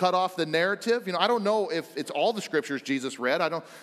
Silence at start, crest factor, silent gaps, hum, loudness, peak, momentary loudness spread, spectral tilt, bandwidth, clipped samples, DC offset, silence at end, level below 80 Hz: 0 s; 20 dB; none; none; -27 LUFS; -8 dBFS; 5 LU; -4 dB/octave; 14.5 kHz; under 0.1%; under 0.1%; 0 s; -84 dBFS